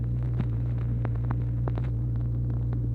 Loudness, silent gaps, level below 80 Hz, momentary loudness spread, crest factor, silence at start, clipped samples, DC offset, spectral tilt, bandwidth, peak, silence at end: -29 LUFS; none; -34 dBFS; 1 LU; 16 dB; 0 s; under 0.1%; under 0.1%; -11 dB/octave; 2.9 kHz; -12 dBFS; 0 s